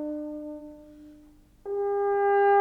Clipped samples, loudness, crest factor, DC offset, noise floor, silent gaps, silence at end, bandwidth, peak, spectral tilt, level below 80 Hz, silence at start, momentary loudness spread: under 0.1%; -27 LUFS; 14 dB; under 0.1%; -55 dBFS; none; 0 s; 3.8 kHz; -12 dBFS; -6.5 dB/octave; -60 dBFS; 0 s; 23 LU